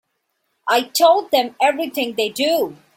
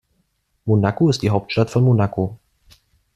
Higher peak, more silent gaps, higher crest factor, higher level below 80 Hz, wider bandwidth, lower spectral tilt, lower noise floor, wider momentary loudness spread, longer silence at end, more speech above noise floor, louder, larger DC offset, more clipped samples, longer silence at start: about the same, -2 dBFS vs -2 dBFS; neither; about the same, 16 dB vs 18 dB; second, -70 dBFS vs -50 dBFS; first, 16.5 kHz vs 10 kHz; second, -2 dB/octave vs -7.5 dB/octave; first, -71 dBFS vs -67 dBFS; about the same, 8 LU vs 9 LU; second, 0.2 s vs 0.8 s; first, 54 dB vs 50 dB; about the same, -18 LUFS vs -19 LUFS; neither; neither; about the same, 0.65 s vs 0.65 s